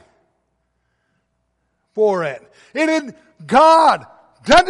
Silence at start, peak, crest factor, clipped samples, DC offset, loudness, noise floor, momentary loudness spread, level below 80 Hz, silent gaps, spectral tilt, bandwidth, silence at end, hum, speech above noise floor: 1.95 s; -2 dBFS; 16 dB; under 0.1%; under 0.1%; -15 LUFS; -69 dBFS; 21 LU; -46 dBFS; none; -4 dB/octave; 11.5 kHz; 0 s; none; 53 dB